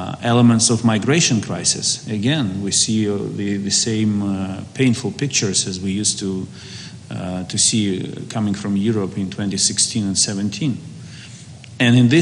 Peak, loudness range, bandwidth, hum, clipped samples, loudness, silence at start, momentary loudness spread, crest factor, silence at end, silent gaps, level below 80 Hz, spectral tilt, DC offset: -2 dBFS; 4 LU; 11.5 kHz; none; under 0.1%; -18 LUFS; 0 s; 16 LU; 16 dB; 0 s; none; -58 dBFS; -4 dB/octave; under 0.1%